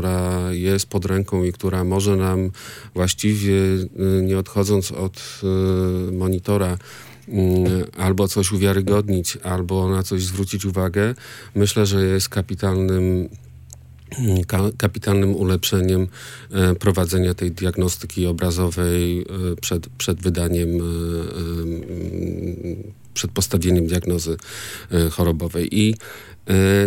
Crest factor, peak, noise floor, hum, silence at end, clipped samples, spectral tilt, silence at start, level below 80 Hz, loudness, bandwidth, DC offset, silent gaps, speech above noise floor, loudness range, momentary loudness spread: 18 dB; -2 dBFS; -42 dBFS; none; 0 s; under 0.1%; -5.5 dB/octave; 0 s; -44 dBFS; -21 LUFS; 17 kHz; under 0.1%; none; 22 dB; 3 LU; 9 LU